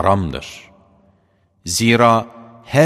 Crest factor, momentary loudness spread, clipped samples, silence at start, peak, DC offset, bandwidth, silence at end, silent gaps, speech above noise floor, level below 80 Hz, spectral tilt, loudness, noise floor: 18 dB; 22 LU; under 0.1%; 0 s; 0 dBFS; under 0.1%; 15.5 kHz; 0 s; none; 43 dB; -44 dBFS; -5 dB/octave; -16 LUFS; -59 dBFS